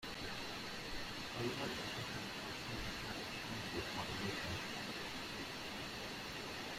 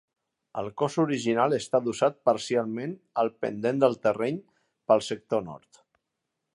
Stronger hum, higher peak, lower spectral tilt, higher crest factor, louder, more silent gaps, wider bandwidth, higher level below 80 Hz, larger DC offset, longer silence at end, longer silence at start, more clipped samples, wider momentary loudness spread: neither; second, -28 dBFS vs -8 dBFS; second, -3.5 dB/octave vs -5.5 dB/octave; about the same, 16 dB vs 20 dB; second, -44 LUFS vs -27 LUFS; neither; first, 16 kHz vs 11.5 kHz; first, -60 dBFS vs -70 dBFS; neither; second, 0 s vs 0.95 s; second, 0 s vs 0.55 s; neither; second, 3 LU vs 12 LU